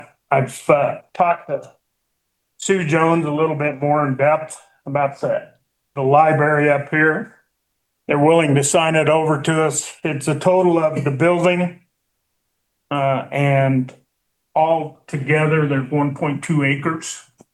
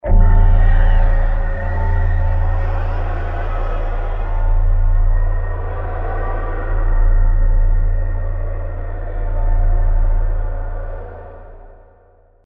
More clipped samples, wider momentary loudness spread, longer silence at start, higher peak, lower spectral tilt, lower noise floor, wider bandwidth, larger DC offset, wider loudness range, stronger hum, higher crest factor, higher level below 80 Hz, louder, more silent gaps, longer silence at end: neither; about the same, 11 LU vs 11 LU; about the same, 0 s vs 0.05 s; about the same, 0 dBFS vs 0 dBFS; second, -5.5 dB/octave vs -10 dB/octave; first, -73 dBFS vs -50 dBFS; first, 12.5 kHz vs 3 kHz; neither; about the same, 4 LU vs 4 LU; neither; about the same, 18 dB vs 14 dB; second, -64 dBFS vs -14 dBFS; first, -18 LUFS vs -21 LUFS; neither; second, 0.35 s vs 0.75 s